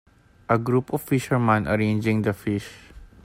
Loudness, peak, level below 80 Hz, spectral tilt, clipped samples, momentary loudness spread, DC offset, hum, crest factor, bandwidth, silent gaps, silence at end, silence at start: -23 LUFS; -6 dBFS; -50 dBFS; -7 dB/octave; under 0.1%; 9 LU; under 0.1%; none; 18 dB; 16 kHz; none; 0.2 s; 0.5 s